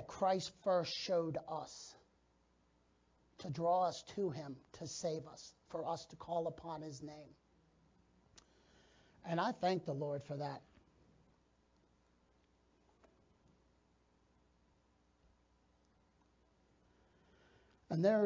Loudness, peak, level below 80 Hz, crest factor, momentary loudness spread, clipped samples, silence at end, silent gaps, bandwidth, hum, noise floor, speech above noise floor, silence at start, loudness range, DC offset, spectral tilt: -40 LUFS; -22 dBFS; -76 dBFS; 22 dB; 16 LU; under 0.1%; 0 s; none; 7.6 kHz; none; -75 dBFS; 35 dB; 0 s; 8 LU; under 0.1%; -5.5 dB/octave